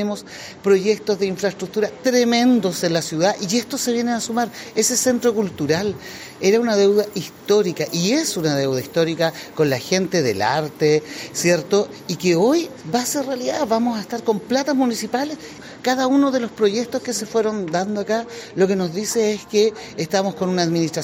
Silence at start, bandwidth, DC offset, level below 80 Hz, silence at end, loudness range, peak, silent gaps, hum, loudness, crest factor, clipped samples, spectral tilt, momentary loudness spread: 0 s; 16.5 kHz; under 0.1%; -62 dBFS; 0 s; 2 LU; -6 dBFS; none; none; -20 LUFS; 14 dB; under 0.1%; -4 dB/octave; 7 LU